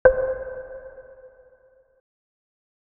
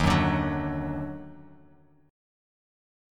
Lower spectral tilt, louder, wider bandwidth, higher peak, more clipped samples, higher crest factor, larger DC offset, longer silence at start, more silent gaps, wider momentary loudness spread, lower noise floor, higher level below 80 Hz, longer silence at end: second, 0.5 dB/octave vs -6.5 dB/octave; about the same, -26 LUFS vs -28 LUFS; second, 2.8 kHz vs 13.5 kHz; first, -2 dBFS vs -10 dBFS; neither; first, 26 dB vs 20 dB; neither; about the same, 0.05 s vs 0 s; neither; first, 24 LU vs 19 LU; about the same, -58 dBFS vs -58 dBFS; about the same, -46 dBFS vs -42 dBFS; about the same, 1.7 s vs 1.65 s